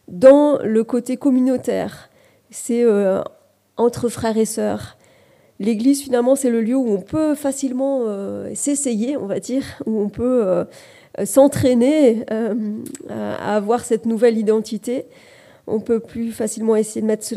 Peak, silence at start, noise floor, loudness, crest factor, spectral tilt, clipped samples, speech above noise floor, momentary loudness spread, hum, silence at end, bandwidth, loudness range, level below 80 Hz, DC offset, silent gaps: 0 dBFS; 0.1 s; -53 dBFS; -19 LUFS; 18 dB; -5.5 dB/octave; under 0.1%; 35 dB; 13 LU; none; 0 s; 15.5 kHz; 4 LU; -56 dBFS; under 0.1%; none